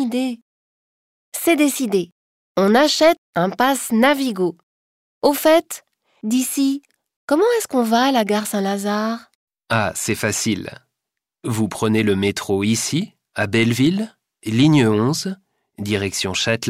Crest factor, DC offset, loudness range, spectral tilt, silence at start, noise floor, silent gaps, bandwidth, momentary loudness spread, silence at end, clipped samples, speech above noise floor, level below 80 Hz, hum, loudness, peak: 16 dB; under 0.1%; 4 LU; -4.5 dB/octave; 0 s; -83 dBFS; 0.42-1.32 s, 2.12-2.55 s, 3.18-3.33 s, 4.63-5.21 s, 7.16-7.28 s, 9.35-9.47 s; 16 kHz; 14 LU; 0 s; under 0.1%; 65 dB; -58 dBFS; none; -19 LUFS; -2 dBFS